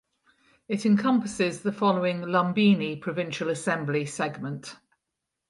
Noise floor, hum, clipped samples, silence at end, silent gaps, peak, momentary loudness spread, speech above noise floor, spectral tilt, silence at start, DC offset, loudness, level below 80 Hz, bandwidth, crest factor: -84 dBFS; none; under 0.1%; 0.75 s; none; -8 dBFS; 11 LU; 58 dB; -6 dB/octave; 0.7 s; under 0.1%; -26 LUFS; -68 dBFS; 11.5 kHz; 18 dB